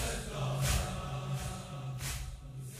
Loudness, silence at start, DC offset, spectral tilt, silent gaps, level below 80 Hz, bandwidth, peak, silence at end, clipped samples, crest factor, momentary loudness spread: -37 LUFS; 0 s; under 0.1%; -4 dB/octave; none; -44 dBFS; 16 kHz; -18 dBFS; 0 s; under 0.1%; 18 dB; 10 LU